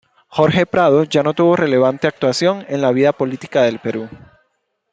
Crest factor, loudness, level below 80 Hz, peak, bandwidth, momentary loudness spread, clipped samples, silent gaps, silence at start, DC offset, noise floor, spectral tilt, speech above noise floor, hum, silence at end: 14 dB; -16 LUFS; -56 dBFS; -2 dBFS; 9.2 kHz; 10 LU; under 0.1%; none; 0.3 s; under 0.1%; -68 dBFS; -6 dB/octave; 53 dB; none; 0.75 s